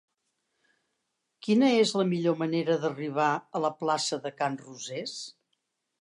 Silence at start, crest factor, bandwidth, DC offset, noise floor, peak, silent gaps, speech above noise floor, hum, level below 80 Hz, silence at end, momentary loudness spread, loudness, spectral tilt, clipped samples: 1.45 s; 18 dB; 11 kHz; under 0.1%; -80 dBFS; -12 dBFS; none; 53 dB; none; -82 dBFS; 0.7 s; 15 LU; -28 LUFS; -5 dB/octave; under 0.1%